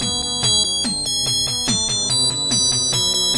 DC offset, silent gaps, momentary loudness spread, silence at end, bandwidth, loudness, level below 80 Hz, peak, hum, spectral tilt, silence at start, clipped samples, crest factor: under 0.1%; none; 3 LU; 0 s; 11.5 kHz; -16 LUFS; -44 dBFS; -4 dBFS; none; -1.5 dB/octave; 0 s; under 0.1%; 14 dB